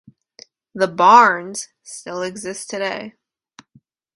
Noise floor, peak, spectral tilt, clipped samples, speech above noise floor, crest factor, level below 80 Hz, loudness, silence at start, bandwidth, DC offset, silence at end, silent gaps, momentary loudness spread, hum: -56 dBFS; 0 dBFS; -3 dB/octave; under 0.1%; 39 dB; 20 dB; -68 dBFS; -16 LUFS; 0.75 s; 11.5 kHz; under 0.1%; 1.05 s; none; 23 LU; none